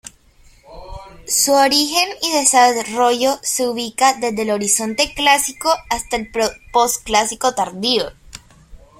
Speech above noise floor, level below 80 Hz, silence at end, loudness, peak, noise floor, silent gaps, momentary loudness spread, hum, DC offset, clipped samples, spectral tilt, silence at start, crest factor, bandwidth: 32 dB; -46 dBFS; 0.2 s; -16 LUFS; 0 dBFS; -49 dBFS; none; 8 LU; none; under 0.1%; under 0.1%; -1 dB/octave; 0.05 s; 18 dB; 16.5 kHz